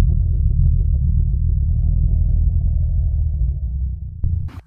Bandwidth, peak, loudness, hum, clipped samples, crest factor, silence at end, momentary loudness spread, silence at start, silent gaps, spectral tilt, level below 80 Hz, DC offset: 1.2 kHz; -4 dBFS; -20 LUFS; none; under 0.1%; 12 dB; 0.05 s; 6 LU; 0 s; none; -12.5 dB/octave; -18 dBFS; under 0.1%